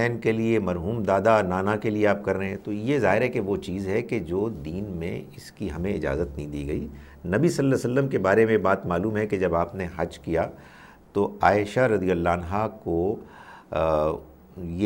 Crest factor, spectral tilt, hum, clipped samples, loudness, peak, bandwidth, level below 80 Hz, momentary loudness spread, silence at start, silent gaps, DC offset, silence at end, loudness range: 20 dB; -7 dB/octave; none; under 0.1%; -25 LUFS; -4 dBFS; 16.5 kHz; -46 dBFS; 12 LU; 0 s; none; under 0.1%; 0 s; 5 LU